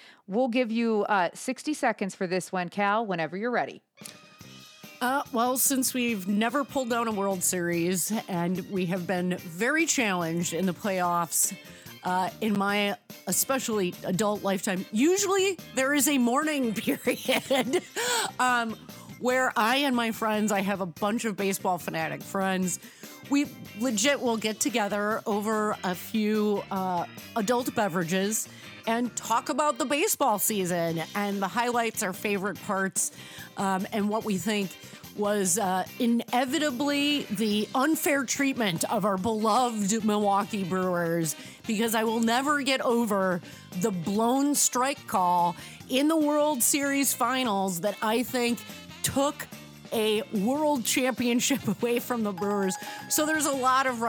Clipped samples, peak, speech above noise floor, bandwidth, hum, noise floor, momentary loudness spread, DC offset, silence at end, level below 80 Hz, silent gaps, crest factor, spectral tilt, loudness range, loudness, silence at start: under 0.1%; -10 dBFS; 22 dB; over 20 kHz; none; -49 dBFS; 8 LU; under 0.1%; 0 s; -70 dBFS; none; 16 dB; -3.5 dB/octave; 3 LU; -27 LUFS; 0 s